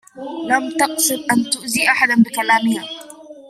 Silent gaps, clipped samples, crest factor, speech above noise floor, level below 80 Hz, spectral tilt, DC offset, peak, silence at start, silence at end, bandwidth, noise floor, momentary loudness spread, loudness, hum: none; under 0.1%; 18 dB; 21 dB; -64 dBFS; -2.5 dB/octave; under 0.1%; -2 dBFS; 0.15 s; 0 s; 15.5 kHz; -38 dBFS; 15 LU; -16 LUFS; none